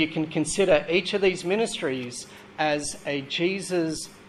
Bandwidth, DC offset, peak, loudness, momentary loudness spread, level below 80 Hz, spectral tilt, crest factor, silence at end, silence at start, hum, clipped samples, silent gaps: 13.5 kHz; under 0.1%; -6 dBFS; -25 LUFS; 10 LU; -56 dBFS; -4 dB/octave; 20 dB; 0 s; 0 s; none; under 0.1%; none